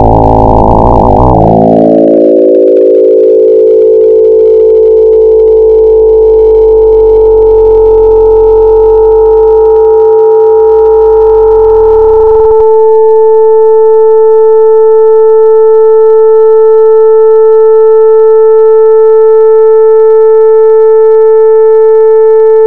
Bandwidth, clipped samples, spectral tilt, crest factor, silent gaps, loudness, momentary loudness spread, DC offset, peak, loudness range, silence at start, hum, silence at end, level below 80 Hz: 2.3 kHz; 6%; -10.5 dB/octave; 4 dB; none; -4 LUFS; 1 LU; 4%; 0 dBFS; 1 LU; 0 s; none; 0 s; -22 dBFS